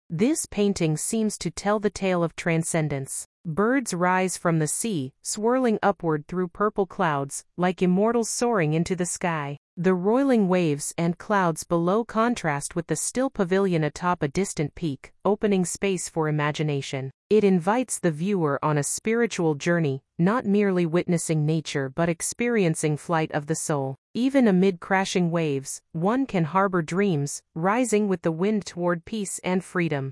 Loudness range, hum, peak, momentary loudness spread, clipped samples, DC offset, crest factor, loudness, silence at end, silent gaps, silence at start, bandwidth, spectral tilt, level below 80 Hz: 2 LU; none; -8 dBFS; 7 LU; under 0.1%; under 0.1%; 16 dB; -24 LUFS; 0 s; 3.25-3.44 s, 9.57-9.77 s, 17.14-17.30 s, 23.98-24.14 s; 0.1 s; 12 kHz; -5.5 dB/octave; -56 dBFS